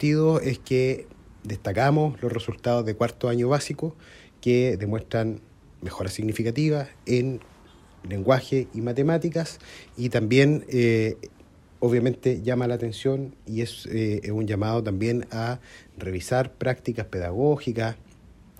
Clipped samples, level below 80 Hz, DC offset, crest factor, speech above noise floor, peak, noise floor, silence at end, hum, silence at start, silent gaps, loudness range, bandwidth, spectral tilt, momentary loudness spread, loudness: under 0.1%; -52 dBFS; under 0.1%; 20 dB; 27 dB; -6 dBFS; -51 dBFS; 0.6 s; none; 0 s; none; 4 LU; 14.5 kHz; -7 dB/octave; 12 LU; -25 LUFS